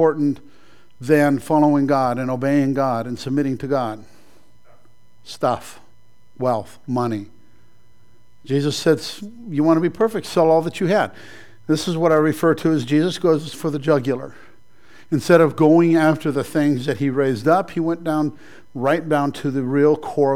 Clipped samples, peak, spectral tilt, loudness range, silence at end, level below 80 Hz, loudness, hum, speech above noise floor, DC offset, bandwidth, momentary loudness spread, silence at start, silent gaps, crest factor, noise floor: under 0.1%; -2 dBFS; -6.5 dB/octave; 9 LU; 0 s; -60 dBFS; -19 LUFS; none; 39 dB; 0.9%; 15.5 kHz; 10 LU; 0 s; none; 18 dB; -58 dBFS